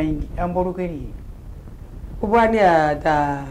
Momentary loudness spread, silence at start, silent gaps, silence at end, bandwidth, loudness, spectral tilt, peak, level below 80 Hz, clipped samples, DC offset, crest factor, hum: 24 LU; 0 s; none; 0 s; 15.5 kHz; -19 LUFS; -7 dB/octave; -4 dBFS; -34 dBFS; under 0.1%; under 0.1%; 16 dB; none